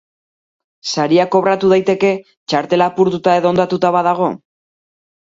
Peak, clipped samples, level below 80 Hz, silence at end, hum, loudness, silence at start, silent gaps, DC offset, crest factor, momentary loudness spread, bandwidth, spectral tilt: 0 dBFS; under 0.1%; -58 dBFS; 0.95 s; none; -15 LUFS; 0.85 s; 2.37-2.47 s; under 0.1%; 16 dB; 8 LU; 7.8 kHz; -5.5 dB/octave